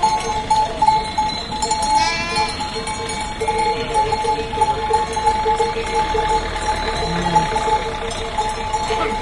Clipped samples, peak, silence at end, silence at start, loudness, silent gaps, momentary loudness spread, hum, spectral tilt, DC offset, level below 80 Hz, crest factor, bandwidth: under 0.1%; -2 dBFS; 0 s; 0 s; -19 LUFS; none; 6 LU; none; -3.5 dB/octave; under 0.1%; -34 dBFS; 16 dB; 11.5 kHz